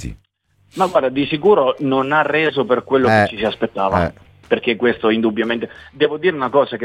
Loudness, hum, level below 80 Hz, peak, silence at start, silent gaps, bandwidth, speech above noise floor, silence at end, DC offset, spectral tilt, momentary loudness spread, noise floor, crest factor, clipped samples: -17 LUFS; none; -46 dBFS; -2 dBFS; 0 s; none; 11 kHz; 43 dB; 0 s; under 0.1%; -6.5 dB/octave; 7 LU; -59 dBFS; 16 dB; under 0.1%